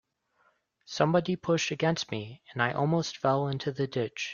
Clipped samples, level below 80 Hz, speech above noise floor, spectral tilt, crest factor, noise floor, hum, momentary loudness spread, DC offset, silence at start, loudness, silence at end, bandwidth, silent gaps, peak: under 0.1%; -66 dBFS; 41 dB; -5.5 dB/octave; 20 dB; -70 dBFS; none; 9 LU; under 0.1%; 0.9 s; -29 LUFS; 0 s; 7.2 kHz; none; -10 dBFS